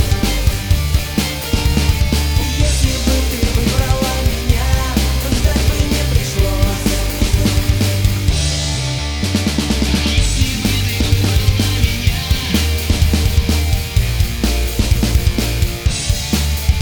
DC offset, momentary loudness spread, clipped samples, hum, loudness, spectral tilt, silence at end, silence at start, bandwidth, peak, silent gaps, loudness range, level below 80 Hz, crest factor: 0.1%; 3 LU; under 0.1%; none; -16 LUFS; -4.5 dB/octave; 0 s; 0 s; over 20 kHz; 0 dBFS; none; 1 LU; -18 dBFS; 14 dB